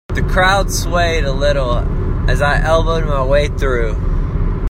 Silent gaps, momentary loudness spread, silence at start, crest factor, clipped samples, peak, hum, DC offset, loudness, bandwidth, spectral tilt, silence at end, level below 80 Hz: none; 7 LU; 0.1 s; 14 dB; under 0.1%; 0 dBFS; none; under 0.1%; -16 LUFS; 15 kHz; -5 dB/octave; 0 s; -18 dBFS